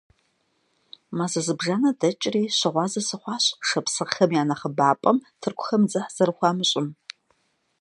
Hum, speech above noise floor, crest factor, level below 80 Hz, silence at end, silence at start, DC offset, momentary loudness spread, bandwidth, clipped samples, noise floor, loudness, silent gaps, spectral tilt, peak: none; 46 dB; 20 dB; -72 dBFS; 0.9 s; 1.1 s; under 0.1%; 8 LU; 11.5 kHz; under 0.1%; -70 dBFS; -23 LUFS; none; -4 dB/octave; -4 dBFS